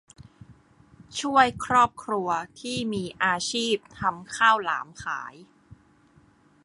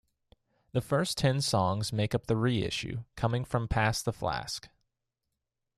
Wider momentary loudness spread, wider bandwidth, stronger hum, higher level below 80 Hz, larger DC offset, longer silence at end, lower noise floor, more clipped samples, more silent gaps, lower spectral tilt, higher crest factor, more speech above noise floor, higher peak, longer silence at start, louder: first, 12 LU vs 8 LU; second, 11.5 kHz vs 14 kHz; neither; second, -58 dBFS vs -50 dBFS; neither; second, 0.9 s vs 1.1 s; second, -59 dBFS vs -85 dBFS; neither; neither; second, -3 dB/octave vs -5 dB/octave; about the same, 22 dB vs 20 dB; second, 33 dB vs 55 dB; first, -4 dBFS vs -12 dBFS; second, 0.2 s vs 0.75 s; first, -25 LUFS vs -31 LUFS